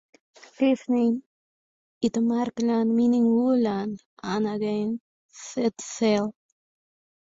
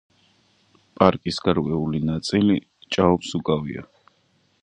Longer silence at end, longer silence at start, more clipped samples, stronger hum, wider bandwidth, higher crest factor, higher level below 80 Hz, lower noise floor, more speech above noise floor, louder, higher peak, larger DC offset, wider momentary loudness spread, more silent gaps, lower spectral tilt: about the same, 0.9 s vs 0.8 s; second, 0.6 s vs 1 s; neither; neither; second, 7.8 kHz vs 10 kHz; second, 14 dB vs 24 dB; second, -66 dBFS vs -48 dBFS; first, under -90 dBFS vs -64 dBFS; first, over 66 dB vs 43 dB; second, -25 LUFS vs -22 LUFS; second, -12 dBFS vs 0 dBFS; neither; first, 12 LU vs 7 LU; first, 1.26-2.01 s, 4.06-4.17 s, 5.00-5.29 s vs none; about the same, -5.5 dB/octave vs -6.5 dB/octave